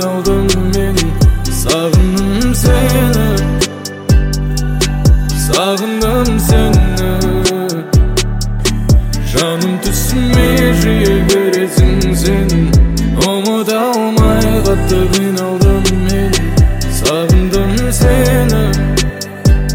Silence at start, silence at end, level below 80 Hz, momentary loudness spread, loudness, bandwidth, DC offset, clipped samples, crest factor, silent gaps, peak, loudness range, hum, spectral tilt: 0 s; 0 s; -16 dBFS; 4 LU; -12 LUFS; 17 kHz; under 0.1%; under 0.1%; 10 dB; none; 0 dBFS; 2 LU; none; -5.5 dB/octave